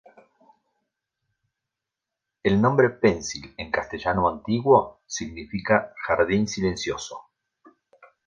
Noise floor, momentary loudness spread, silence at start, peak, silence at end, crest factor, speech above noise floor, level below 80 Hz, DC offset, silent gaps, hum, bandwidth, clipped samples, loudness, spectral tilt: -86 dBFS; 14 LU; 2.45 s; -4 dBFS; 1.05 s; 22 dB; 63 dB; -50 dBFS; under 0.1%; none; none; 9.8 kHz; under 0.1%; -24 LUFS; -5.5 dB/octave